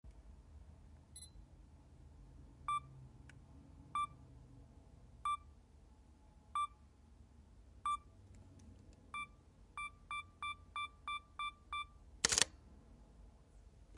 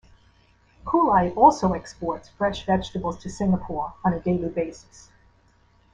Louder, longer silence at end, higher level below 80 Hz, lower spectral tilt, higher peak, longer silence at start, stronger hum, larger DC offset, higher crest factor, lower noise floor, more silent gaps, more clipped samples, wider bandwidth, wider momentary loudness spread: second, -42 LUFS vs -23 LUFS; second, 0 s vs 1.15 s; second, -62 dBFS vs -46 dBFS; second, -0.5 dB/octave vs -7 dB/octave; second, -10 dBFS vs -2 dBFS; second, 0.05 s vs 0.85 s; neither; neither; first, 38 dB vs 22 dB; first, -64 dBFS vs -59 dBFS; neither; neither; first, 11.5 kHz vs 9.6 kHz; first, 21 LU vs 14 LU